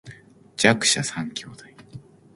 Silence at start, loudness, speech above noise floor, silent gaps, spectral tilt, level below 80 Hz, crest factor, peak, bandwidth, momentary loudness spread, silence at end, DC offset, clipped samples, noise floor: 0.05 s; -21 LUFS; 24 dB; none; -2.5 dB/octave; -62 dBFS; 26 dB; 0 dBFS; 11.5 kHz; 21 LU; 0.35 s; under 0.1%; under 0.1%; -47 dBFS